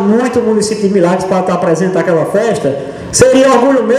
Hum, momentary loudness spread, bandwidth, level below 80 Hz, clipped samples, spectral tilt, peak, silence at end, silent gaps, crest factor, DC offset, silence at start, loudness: none; 7 LU; 14 kHz; -42 dBFS; 0.2%; -5 dB/octave; 0 dBFS; 0 s; none; 10 dB; under 0.1%; 0 s; -11 LUFS